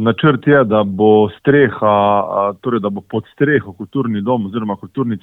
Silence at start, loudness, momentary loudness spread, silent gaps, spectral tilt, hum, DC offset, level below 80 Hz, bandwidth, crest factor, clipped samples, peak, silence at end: 0 s; -15 LUFS; 10 LU; none; -9.5 dB/octave; none; under 0.1%; -54 dBFS; 4 kHz; 14 dB; under 0.1%; 0 dBFS; 0.05 s